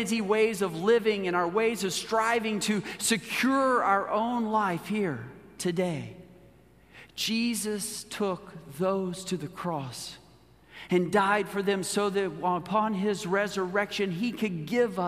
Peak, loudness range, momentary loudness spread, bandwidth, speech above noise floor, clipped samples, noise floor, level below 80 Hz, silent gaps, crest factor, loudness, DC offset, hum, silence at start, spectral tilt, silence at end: -10 dBFS; 6 LU; 10 LU; 15.5 kHz; 29 dB; under 0.1%; -57 dBFS; -64 dBFS; none; 18 dB; -28 LUFS; under 0.1%; none; 0 s; -4.5 dB/octave; 0 s